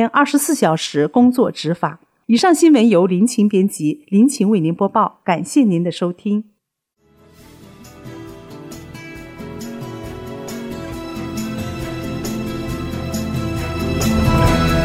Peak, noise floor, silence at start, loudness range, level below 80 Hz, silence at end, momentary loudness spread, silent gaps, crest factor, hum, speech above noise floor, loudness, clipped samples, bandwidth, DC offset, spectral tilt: -2 dBFS; -70 dBFS; 0 s; 18 LU; -34 dBFS; 0 s; 20 LU; none; 14 dB; none; 55 dB; -17 LUFS; under 0.1%; 16.5 kHz; under 0.1%; -5.5 dB/octave